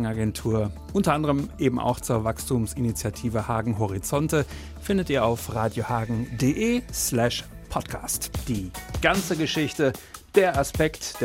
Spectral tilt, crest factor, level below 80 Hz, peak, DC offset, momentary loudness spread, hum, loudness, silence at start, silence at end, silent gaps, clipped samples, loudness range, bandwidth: -5 dB/octave; 20 dB; -42 dBFS; -4 dBFS; under 0.1%; 7 LU; none; -25 LUFS; 0 s; 0 s; none; under 0.1%; 1 LU; 16.5 kHz